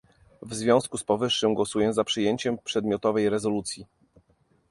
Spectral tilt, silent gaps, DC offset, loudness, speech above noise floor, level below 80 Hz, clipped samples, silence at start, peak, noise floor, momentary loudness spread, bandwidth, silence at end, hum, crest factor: -4.5 dB/octave; none; under 0.1%; -25 LUFS; 40 dB; -60 dBFS; under 0.1%; 0.4 s; -6 dBFS; -66 dBFS; 7 LU; 11.5 kHz; 0.85 s; none; 20 dB